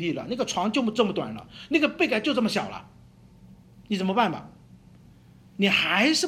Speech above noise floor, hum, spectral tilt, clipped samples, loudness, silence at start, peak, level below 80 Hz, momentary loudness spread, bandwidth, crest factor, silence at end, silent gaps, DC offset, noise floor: 27 dB; none; -4 dB/octave; under 0.1%; -25 LUFS; 0 s; -8 dBFS; -60 dBFS; 16 LU; 15 kHz; 18 dB; 0 s; none; under 0.1%; -52 dBFS